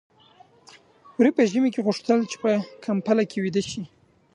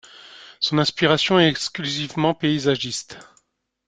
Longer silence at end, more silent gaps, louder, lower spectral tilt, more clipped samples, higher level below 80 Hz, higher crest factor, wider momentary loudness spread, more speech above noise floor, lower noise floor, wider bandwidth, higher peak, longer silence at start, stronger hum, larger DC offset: second, 0.5 s vs 0.65 s; neither; second, -23 LUFS vs -20 LUFS; first, -6 dB/octave vs -4.5 dB/octave; neither; second, -66 dBFS vs -58 dBFS; about the same, 18 dB vs 20 dB; about the same, 12 LU vs 11 LU; second, 32 dB vs 44 dB; second, -55 dBFS vs -65 dBFS; first, 10.5 kHz vs 9.4 kHz; second, -6 dBFS vs -2 dBFS; first, 1.2 s vs 0.2 s; neither; neither